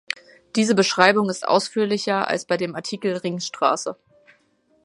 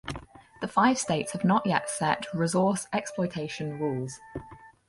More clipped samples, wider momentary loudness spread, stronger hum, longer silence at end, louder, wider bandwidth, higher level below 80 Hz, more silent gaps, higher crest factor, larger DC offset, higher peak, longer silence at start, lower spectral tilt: neither; second, 11 LU vs 15 LU; neither; first, 0.9 s vs 0.2 s; first, -21 LUFS vs -28 LUFS; about the same, 11.5 kHz vs 11.5 kHz; second, -70 dBFS vs -58 dBFS; neither; about the same, 22 dB vs 20 dB; neither; first, 0 dBFS vs -8 dBFS; about the same, 0.1 s vs 0.05 s; about the same, -4 dB/octave vs -5 dB/octave